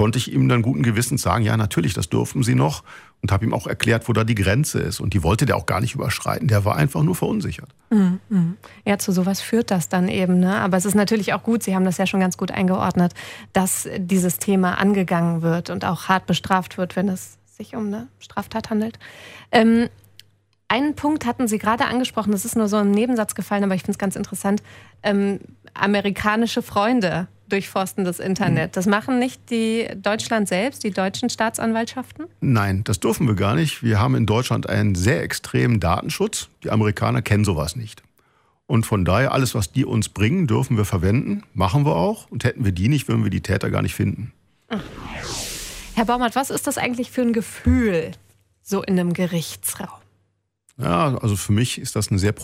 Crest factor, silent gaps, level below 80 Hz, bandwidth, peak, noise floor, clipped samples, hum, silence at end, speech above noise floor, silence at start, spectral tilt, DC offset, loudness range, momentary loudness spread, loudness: 18 dB; none; -44 dBFS; 16 kHz; -2 dBFS; -69 dBFS; under 0.1%; none; 0 s; 48 dB; 0 s; -5.5 dB/octave; under 0.1%; 3 LU; 9 LU; -21 LUFS